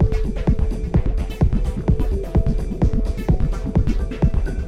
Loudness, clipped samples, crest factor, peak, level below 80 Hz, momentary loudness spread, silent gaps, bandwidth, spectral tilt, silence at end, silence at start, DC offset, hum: -22 LUFS; under 0.1%; 14 dB; -4 dBFS; -20 dBFS; 2 LU; none; 9 kHz; -9 dB/octave; 0 s; 0 s; under 0.1%; none